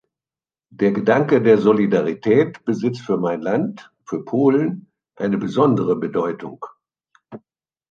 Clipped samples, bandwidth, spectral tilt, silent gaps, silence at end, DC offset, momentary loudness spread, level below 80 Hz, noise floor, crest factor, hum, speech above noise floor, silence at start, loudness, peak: under 0.1%; 7.2 kHz; -8 dB/octave; none; 0.55 s; under 0.1%; 15 LU; -64 dBFS; under -90 dBFS; 18 dB; none; over 72 dB; 0.8 s; -19 LUFS; -2 dBFS